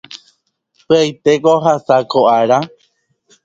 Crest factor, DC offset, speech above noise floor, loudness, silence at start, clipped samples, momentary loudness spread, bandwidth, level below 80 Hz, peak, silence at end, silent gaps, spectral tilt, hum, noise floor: 14 dB; under 0.1%; 49 dB; -13 LUFS; 0.1 s; under 0.1%; 4 LU; 7.8 kHz; -60 dBFS; 0 dBFS; 0.8 s; none; -5.5 dB/octave; none; -61 dBFS